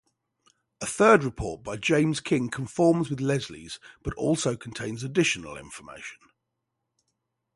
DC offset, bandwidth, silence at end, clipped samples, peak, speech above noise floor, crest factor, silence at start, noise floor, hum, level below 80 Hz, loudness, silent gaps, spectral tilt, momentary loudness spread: under 0.1%; 11.5 kHz; 1.4 s; under 0.1%; -6 dBFS; 56 dB; 22 dB; 0.8 s; -82 dBFS; none; -52 dBFS; -25 LUFS; none; -5 dB/octave; 19 LU